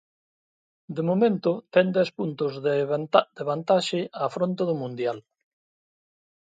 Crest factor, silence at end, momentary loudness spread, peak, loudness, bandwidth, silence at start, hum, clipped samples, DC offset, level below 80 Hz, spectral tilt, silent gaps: 24 dB; 1.25 s; 8 LU; -2 dBFS; -25 LUFS; 9.2 kHz; 0.9 s; none; under 0.1%; under 0.1%; -74 dBFS; -6.5 dB/octave; none